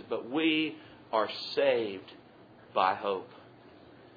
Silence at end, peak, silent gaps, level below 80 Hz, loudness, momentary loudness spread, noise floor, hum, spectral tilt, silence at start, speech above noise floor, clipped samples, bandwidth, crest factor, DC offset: 0.15 s; -12 dBFS; none; -78 dBFS; -31 LUFS; 17 LU; -55 dBFS; none; -6 dB/octave; 0 s; 25 dB; under 0.1%; 5 kHz; 20 dB; under 0.1%